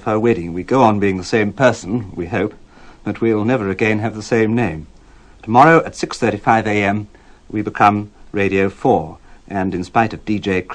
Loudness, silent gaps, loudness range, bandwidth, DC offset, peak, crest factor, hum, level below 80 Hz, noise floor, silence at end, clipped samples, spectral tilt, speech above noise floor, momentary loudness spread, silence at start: -17 LUFS; none; 3 LU; 10 kHz; under 0.1%; 0 dBFS; 18 dB; none; -44 dBFS; -44 dBFS; 0 s; under 0.1%; -6.5 dB/octave; 28 dB; 11 LU; 0 s